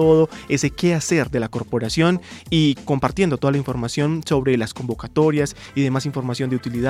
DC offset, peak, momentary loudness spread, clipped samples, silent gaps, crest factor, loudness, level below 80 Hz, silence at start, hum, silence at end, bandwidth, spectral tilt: under 0.1%; -2 dBFS; 6 LU; under 0.1%; none; 16 dB; -21 LUFS; -44 dBFS; 0 s; none; 0 s; 14.5 kHz; -6 dB/octave